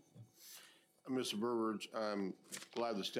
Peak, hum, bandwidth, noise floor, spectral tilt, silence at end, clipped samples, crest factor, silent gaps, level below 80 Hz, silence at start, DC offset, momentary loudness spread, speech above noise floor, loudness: -26 dBFS; none; 16 kHz; -64 dBFS; -4 dB/octave; 0 s; under 0.1%; 18 dB; none; under -90 dBFS; 0.15 s; under 0.1%; 19 LU; 24 dB; -41 LUFS